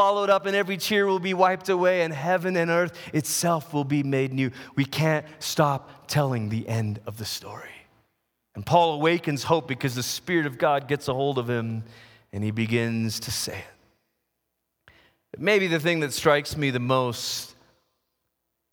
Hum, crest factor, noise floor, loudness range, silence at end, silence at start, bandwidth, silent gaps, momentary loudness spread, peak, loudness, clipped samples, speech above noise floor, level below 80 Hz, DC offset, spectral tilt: none; 20 dB; -79 dBFS; 5 LU; 1.2 s; 0 s; over 20 kHz; none; 10 LU; -4 dBFS; -25 LUFS; under 0.1%; 55 dB; -60 dBFS; under 0.1%; -5 dB/octave